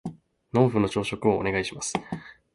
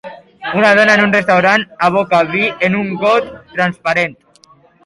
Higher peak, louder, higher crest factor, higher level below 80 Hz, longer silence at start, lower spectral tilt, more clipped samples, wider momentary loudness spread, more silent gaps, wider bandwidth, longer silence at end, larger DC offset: second, -6 dBFS vs 0 dBFS; second, -26 LUFS vs -13 LUFS; first, 20 dB vs 14 dB; about the same, -54 dBFS vs -54 dBFS; about the same, 0.05 s vs 0.05 s; about the same, -5.5 dB/octave vs -5.5 dB/octave; neither; first, 16 LU vs 9 LU; neither; about the same, 11.5 kHz vs 11.5 kHz; second, 0.2 s vs 0.7 s; neither